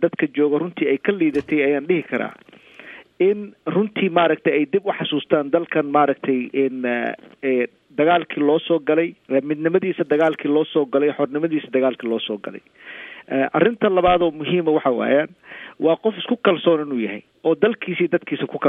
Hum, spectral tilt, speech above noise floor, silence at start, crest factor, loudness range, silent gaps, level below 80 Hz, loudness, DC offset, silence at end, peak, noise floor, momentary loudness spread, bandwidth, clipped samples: none; -8.5 dB/octave; 23 dB; 0 s; 18 dB; 2 LU; none; -56 dBFS; -20 LUFS; under 0.1%; 0 s; -2 dBFS; -42 dBFS; 9 LU; 3.9 kHz; under 0.1%